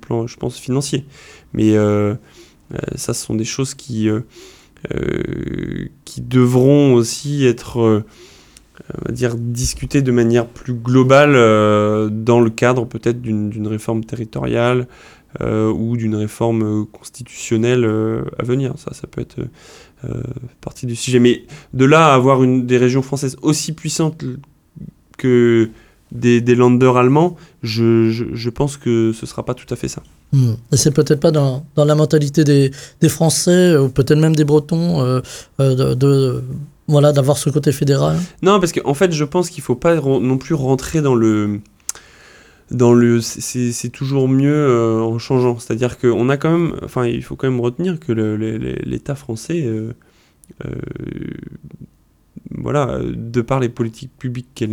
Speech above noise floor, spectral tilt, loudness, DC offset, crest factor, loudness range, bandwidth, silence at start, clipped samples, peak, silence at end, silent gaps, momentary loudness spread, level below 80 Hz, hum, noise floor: 30 dB; -6 dB/octave; -16 LUFS; under 0.1%; 16 dB; 9 LU; 17 kHz; 0.1 s; under 0.1%; 0 dBFS; 0 s; none; 16 LU; -44 dBFS; none; -45 dBFS